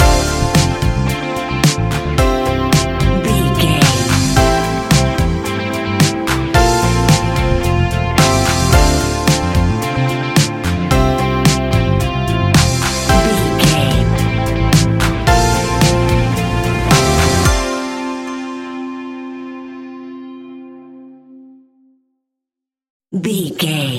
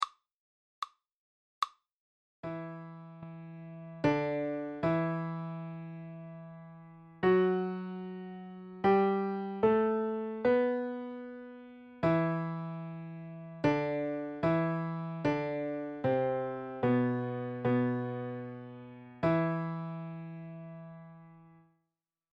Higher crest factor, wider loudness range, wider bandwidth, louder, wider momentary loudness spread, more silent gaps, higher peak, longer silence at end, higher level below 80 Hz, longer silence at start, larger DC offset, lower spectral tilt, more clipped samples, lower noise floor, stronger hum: about the same, 14 dB vs 18 dB; first, 14 LU vs 6 LU; first, 17 kHz vs 8.2 kHz; first, -14 LUFS vs -33 LUFS; second, 13 LU vs 19 LU; second, 22.90-23.00 s vs 0.32-0.82 s, 1.12-1.62 s, 1.92-2.43 s; first, 0 dBFS vs -16 dBFS; second, 0 s vs 0.85 s; first, -22 dBFS vs -68 dBFS; about the same, 0 s vs 0 s; neither; second, -5 dB/octave vs -8.5 dB/octave; neither; about the same, -84 dBFS vs -87 dBFS; neither